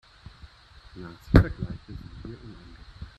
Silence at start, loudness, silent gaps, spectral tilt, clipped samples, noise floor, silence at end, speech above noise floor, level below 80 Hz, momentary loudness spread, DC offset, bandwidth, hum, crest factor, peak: 0.95 s; -24 LUFS; none; -8.5 dB/octave; under 0.1%; -51 dBFS; 0.1 s; 25 dB; -34 dBFS; 27 LU; under 0.1%; 12 kHz; none; 26 dB; -2 dBFS